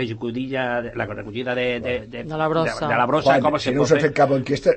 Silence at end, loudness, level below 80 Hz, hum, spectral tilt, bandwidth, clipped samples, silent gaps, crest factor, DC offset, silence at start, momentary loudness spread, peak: 0 s; -21 LUFS; -48 dBFS; none; -6 dB/octave; 8.8 kHz; under 0.1%; none; 16 dB; under 0.1%; 0 s; 11 LU; -4 dBFS